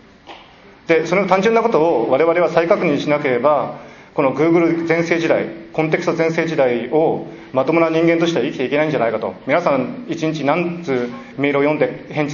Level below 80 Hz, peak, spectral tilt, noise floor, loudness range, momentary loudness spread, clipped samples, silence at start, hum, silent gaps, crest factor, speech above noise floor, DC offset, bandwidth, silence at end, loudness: -58 dBFS; 0 dBFS; -6.5 dB/octave; -44 dBFS; 3 LU; 8 LU; under 0.1%; 0.25 s; none; none; 16 dB; 27 dB; under 0.1%; 7.2 kHz; 0 s; -17 LUFS